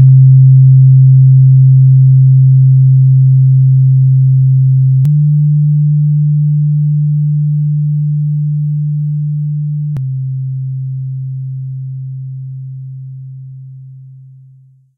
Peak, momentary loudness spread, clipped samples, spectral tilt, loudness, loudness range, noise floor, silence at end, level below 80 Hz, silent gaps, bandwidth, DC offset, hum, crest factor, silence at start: 0 dBFS; 18 LU; under 0.1%; -14 dB/octave; -9 LUFS; 17 LU; -43 dBFS; 0.9 s; -46 dBFS; none; 0.3 kHz; under 0.1%; none; 8 dB; 0 s